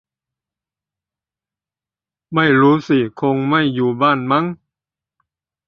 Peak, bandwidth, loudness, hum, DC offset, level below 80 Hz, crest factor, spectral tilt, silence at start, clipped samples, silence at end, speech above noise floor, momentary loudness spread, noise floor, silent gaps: -2 dBFS; 6.8 kHz; -16 LUFS; none; under 0.1%; -58 dBFS; 18 dB; -8 dB/octave; 2.3 s; under 0.1%; 1.1 s; over 75 dB; 6 LU; under -90 dBFS; none